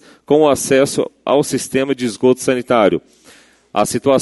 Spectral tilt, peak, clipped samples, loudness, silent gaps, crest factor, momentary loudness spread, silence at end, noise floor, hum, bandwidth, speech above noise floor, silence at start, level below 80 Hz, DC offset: -4.5 dB/octave; 0 dBFS; under 0.1%; -16 LUFS; none; 16 dB; 6 LU; 0 s; -47 dBFS; none; 12 kHz; 32 dB; 0.3 s; -52 dBFS; under 0.1%